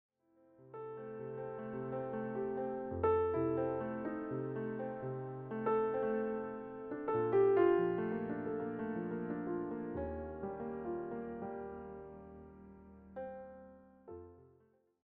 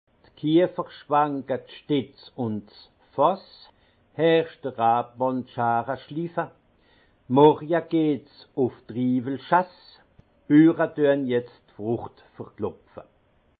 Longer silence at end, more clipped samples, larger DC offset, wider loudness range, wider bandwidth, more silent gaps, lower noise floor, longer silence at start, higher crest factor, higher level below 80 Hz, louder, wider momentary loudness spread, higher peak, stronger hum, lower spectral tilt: about the same, 0.6 s vs 0.6 s; neither; neither; first, 12 LU vs 3 LU; second, 3.8 kHz vs 4.8 kHz; neither; first, -71 dBFS vs -63 dBFS; first, 0.6 s vs 0.45 s; about the same, 20 dB vs 22 dB; about the same, -64 dBFS vs -68 dBFS; second, -38 LUFS vs -24 LUFS; first, 20 LU vs 17 LU; second, -20 dBFS vs -4 dBFS; neither; second, -8 dB/octave vs -11 dB/octave